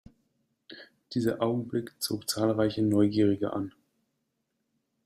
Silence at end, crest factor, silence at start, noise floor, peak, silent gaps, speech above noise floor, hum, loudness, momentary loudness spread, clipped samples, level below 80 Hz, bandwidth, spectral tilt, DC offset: 1.35 s; 18 dB; 0.7 s; -80 dBFS; -12 dBFS; none; 52 dB; none; -28 LUFS; 15 LU; under 0.1%; -64 dBFS; 15.5 kHz; -6 dB/octave; under 0.1%